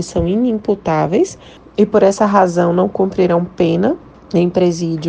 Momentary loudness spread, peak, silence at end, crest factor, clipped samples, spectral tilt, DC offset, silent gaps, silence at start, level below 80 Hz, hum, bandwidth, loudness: 6 LU; 0 dBFS; 0 s; 14 dB; under 0.1%; -7 dB/octave; under 0.1%; none; 0 s; -40 dBFS; none; 9.4 kHz; -15 LUFS